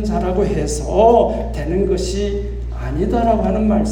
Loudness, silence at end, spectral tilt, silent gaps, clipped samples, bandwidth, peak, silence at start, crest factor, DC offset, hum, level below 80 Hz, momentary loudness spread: -17 LUFS; 0 s; -6.5 dB/octave; none; under 0.1%; 11.5 kHz; 0 dBFS; 0 s; 16 dB; under 0.1%; 60 Hz at -40 dBFS; -24 dBFS; 11 LU